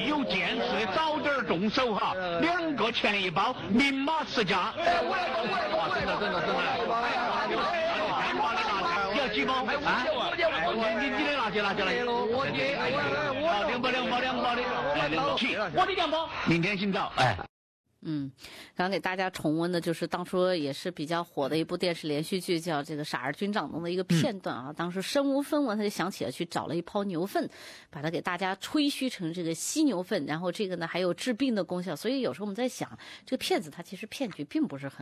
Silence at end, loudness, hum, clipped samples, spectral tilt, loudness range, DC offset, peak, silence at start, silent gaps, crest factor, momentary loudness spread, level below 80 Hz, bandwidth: 0 s; -29 LUFS; none; under 0.1%; -4.5 dB/octave; 4 LU; under 0.1%; -12 dBFS; 0 s; 17.49-17.84 s; 16 dB; 7 LU; -58 dBFS; 14.5 kHz